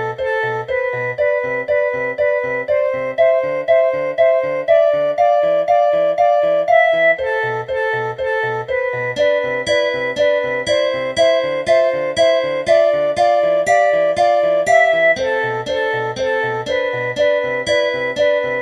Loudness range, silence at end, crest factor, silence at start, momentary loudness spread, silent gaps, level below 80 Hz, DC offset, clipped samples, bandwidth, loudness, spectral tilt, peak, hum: 4 LU; 0 s; 14 dB; 0 s; 6 LU; none; -52 dBFS; under 0.1%; under 0.1%; 10.5 kHz; -16 LUFS; -4 dB/octave; -2 dBFS; none